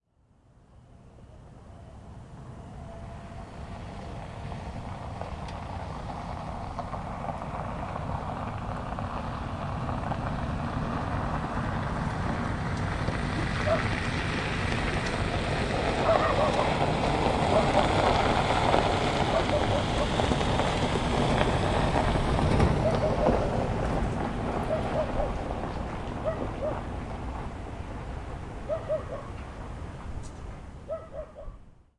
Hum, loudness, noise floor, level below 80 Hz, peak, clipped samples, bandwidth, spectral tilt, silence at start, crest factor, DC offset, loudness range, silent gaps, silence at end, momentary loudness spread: none; -29 LUFS; -63 dBFS; -38 dBFS; -6 dBFS; under 0.1%; 11.5 kHz; -6 dB/octave; 0.75 s; 24 dB; under 0.1%; 14 LU; none; 0.3 s; 17 LU